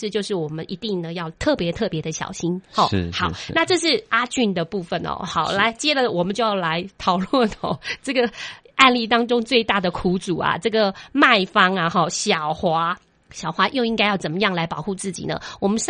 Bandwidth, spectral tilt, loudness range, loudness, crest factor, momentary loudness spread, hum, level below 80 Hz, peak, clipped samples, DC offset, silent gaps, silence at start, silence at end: 10 kHz; -4 dB/octave; 4 LU; -21 LUFS; 22 dB; 10 LU; none; -50 dBFS; 0 dBFS; under 0.1%; under 0.1%; none; 0 s; 0 s